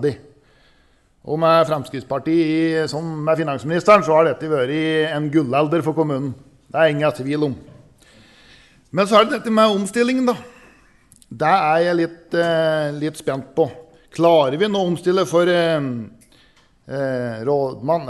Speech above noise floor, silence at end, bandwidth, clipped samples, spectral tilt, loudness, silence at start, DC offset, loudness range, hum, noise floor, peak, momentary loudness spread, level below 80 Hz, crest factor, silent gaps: 39 dB; 0 s; 12 kHz; under 0.1%; -6 dB/octave; -19 LUFS; 0 s; under 0.1%; 3 LU; none; -57 dBFS; -2 dBFS; 11 LU; -58 dBFS; 18 dB; none